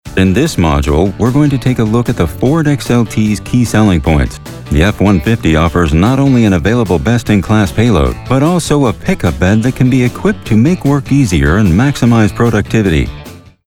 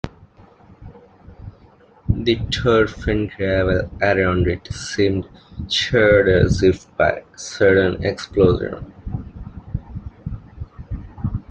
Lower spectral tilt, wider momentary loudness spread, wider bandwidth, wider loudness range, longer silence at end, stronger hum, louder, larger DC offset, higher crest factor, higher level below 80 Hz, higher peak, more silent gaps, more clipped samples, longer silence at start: about the same, -6.5 dB/octave vs -6 dB/octave; second, 4 LU vs 19 LU; first, 17 kHz vs 9.4 kHz; second, 1 LU vs 6 LU; first, 0.3 s vs 0.1 s; neither; first, -11 LUFS vs -18 LUFS; neither; second, 10 dB vs 18 dB; first, -24 dBFS vs -36 dBFS; about the same, 0 dBFS vs -2 dBFS; neither; neither; about the same, 0.05 s vs 0.05 s